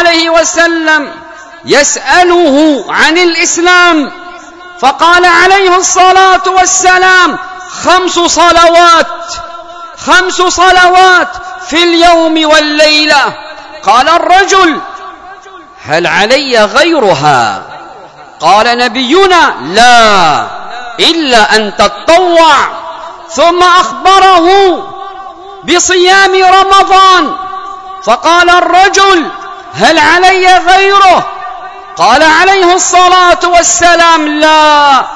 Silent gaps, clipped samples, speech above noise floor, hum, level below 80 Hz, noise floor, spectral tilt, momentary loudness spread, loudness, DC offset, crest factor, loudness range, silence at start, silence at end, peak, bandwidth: none; 8%; 25 dB; none; -36 dBFS; -30 dBFS; -1.5 dB/octave; 17 LU; -5 LUFS; under 0.1%; 6 dB; 3 LU; 0 s; 0 s; 0 dBFS; 11 kHz